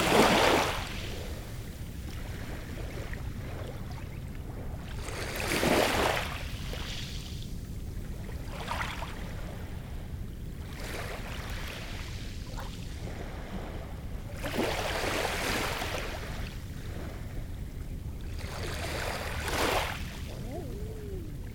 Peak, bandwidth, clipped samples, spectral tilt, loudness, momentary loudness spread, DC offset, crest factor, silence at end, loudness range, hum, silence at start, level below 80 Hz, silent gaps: -8 dBFS; over 20 kHz; under 0.1%; -4 dB/octave; -34 LUFS; 13 LU; under 0.1%; 26 dB; 0 s; 8 LU; none; 0 s; -40 dBFS; none